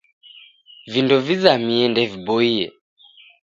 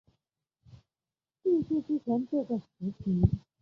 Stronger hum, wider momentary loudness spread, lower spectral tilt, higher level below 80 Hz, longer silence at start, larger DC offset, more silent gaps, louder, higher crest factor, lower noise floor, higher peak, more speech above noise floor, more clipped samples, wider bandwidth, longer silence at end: neither; about the same, 8 LU vs 8 LU; second, -6 dB/octave vs -12 dB/octave; second, -62 dBFS vs -46 dBFS; second, 0.85 s vs 1.45 s; neither; neither; first, -18 LUFS vs -31 LUFS; about the same, 20 dB vs 22 dB; second, -47 dBFS vs under -90 dBFS; first, 0 dBFS vs -10 dBFS; second, 29 dB vs over 61 dB; neither; first, 7.6 kHz vs 6 kHz; first, 0.8 s vs 0.25 s